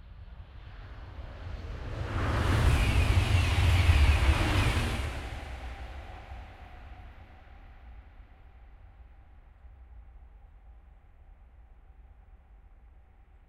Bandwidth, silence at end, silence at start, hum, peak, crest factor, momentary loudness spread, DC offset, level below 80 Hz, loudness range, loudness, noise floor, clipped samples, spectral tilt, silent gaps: 14 kHz; 1.15 s; 0.05 s; none; -10 dBFS; 20 dB; 25 LU; under 0.1%; -34 dBFS; 22 LU; -28 LUFS; -56 dBFS; under 0.1%; -5.5 dB/octave; none